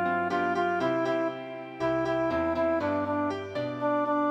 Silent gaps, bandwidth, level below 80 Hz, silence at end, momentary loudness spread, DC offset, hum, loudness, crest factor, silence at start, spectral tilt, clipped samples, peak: none; 8.4 kHz; -58 dBFS; 0 s; 6 LU; under 0.1%; none; -28 LUFS; 12 dB; 0 s; -7 dB/octave; under 0.1%; -16 dBFS